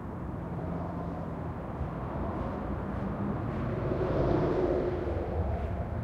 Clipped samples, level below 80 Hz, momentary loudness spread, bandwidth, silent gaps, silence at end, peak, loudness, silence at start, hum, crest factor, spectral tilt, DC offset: under 0.1%; -40 dBFS; 9 LU; 7.4 kHz; none; 0 s; -14 dBFS; -33 LUFS; 0 s; none; 18 dB; -9.5 dB/octave; under 0.1%